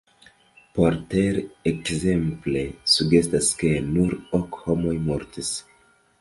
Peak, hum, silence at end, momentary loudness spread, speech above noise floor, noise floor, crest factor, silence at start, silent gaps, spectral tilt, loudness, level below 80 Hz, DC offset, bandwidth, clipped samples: -4 dBFS; none; 0.6 s; 9 LU; 36 dB; -59 dBFS; 20 dB; 0.75 s; none; -5 dB/octave; -23 LUFS; -44 dBFS; under 0.1%; 11.5 kHz; under 0.1%